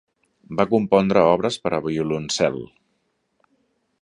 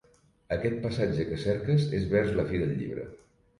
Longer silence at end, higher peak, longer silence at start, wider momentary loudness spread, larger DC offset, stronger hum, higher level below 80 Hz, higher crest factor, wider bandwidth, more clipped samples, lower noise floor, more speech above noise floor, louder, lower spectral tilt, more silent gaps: first, 1.35 s vs 0.45 s; first, -2 dBFS vs -12 dBFS; about the same, 0.5 s vs 0.5 s; about the same, 11 LU vs 9 LU; neither; neither; second, -54 dBFS vs -48 dBFS; about the same, 20 dB vs 16 dB; about the same, 11 kHz vs 11.5 kHz; neither; first, -71 dBFS vs -53 dBFS; first, 51 dB vs 25 dB; first, -20 LUFS vs -29 LUFS; second, -5.5 dB/octave vs -8 dB/octave; neither